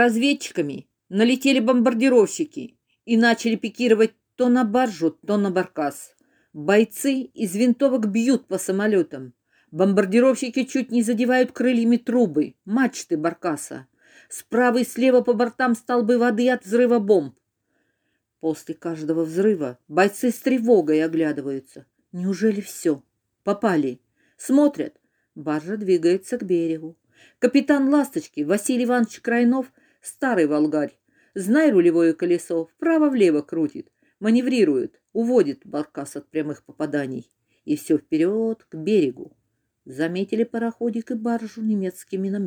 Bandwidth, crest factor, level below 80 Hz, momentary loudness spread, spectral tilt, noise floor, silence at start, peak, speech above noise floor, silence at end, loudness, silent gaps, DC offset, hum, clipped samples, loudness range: over 20 kHz; 18 dB; -74 dBFS; 12 LU; -5.5 dB/octave; -74 dBFS; 0 s; -4 dBFS; 53 dB; 0 s; -22 LUFS; none; under 0.1%; none; under 0.1%; 5 LU